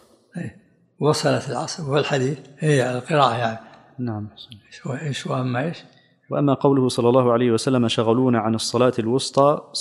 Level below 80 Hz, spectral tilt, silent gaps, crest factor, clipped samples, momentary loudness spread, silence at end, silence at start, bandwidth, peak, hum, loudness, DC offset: -62 dBFS; -5.5 dB/octave; none; 20 dB; under 0.1%; 16 LU; 0 s; 0.35 s; 12.5 kHz; -2 dBFS; none; -21 LUFS; under 0.1%